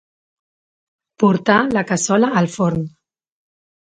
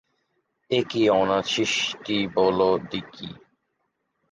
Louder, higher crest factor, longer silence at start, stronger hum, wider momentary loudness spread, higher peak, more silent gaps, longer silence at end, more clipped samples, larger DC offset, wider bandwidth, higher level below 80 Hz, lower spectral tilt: first, -17 LUFS vs -23 LUFS; about the same, 20 dB vs 18 dB; first, 1.2 s vs 0.7 s; neither; second, 6 LU vs 14 LU; first, 0 dBFS vs -8 dBFS; neither; about the same, 1.05 s vs 0.95 s; neither; neither; about the same, 9.4 kHz vs 9.8 kHz; first, -54 dBFS vs -60 dBFS; first, -5.5 dB/octave vs -4 dB/octave